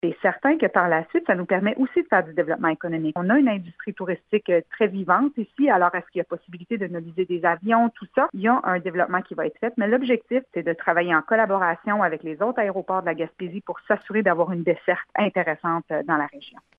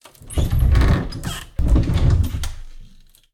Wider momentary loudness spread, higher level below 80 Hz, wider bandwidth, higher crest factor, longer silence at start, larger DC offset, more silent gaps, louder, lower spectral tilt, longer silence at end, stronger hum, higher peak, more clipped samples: about the same, 10 LU vs 12 LU; second, -72 dBFS vs -20 dBFS; second, 4.8 kHz vs 16 kHz; first, 20 dB vs 14 dB; second, 0.05 s vs 0.2 s; neither; neither; second, -23 LUFS vs -20 LUFS; first, -9.5 dB/octave vs -6.5 dB/octave; second, 0.3 s vs 0.45 s; neither; about the same, -4 dBFS vs -4 dBFS; neither